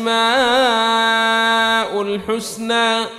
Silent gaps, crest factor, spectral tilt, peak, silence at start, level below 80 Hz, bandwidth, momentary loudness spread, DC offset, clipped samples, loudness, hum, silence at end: none; 12 dB; -2 dB/octave; -4 dBFS; 0 s; -52 dBFS; 15.5 kHz; 8 LU; under 0.1%; under 0.1%; -16 LUFS; none; 0 s